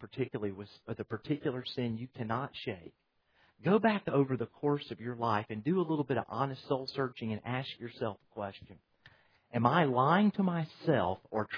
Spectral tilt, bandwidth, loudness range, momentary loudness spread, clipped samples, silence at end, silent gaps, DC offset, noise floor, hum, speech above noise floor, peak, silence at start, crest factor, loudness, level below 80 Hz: -9 dB/octave; 5.4 kHz; 7 LU; 14 LU; under 0.1%; 0 s; none; under 0.1%; -70 dBFS; none; 37 dB; -10 dBFS; 0 s; 22 dB; -33 LUFS; -70 dBFS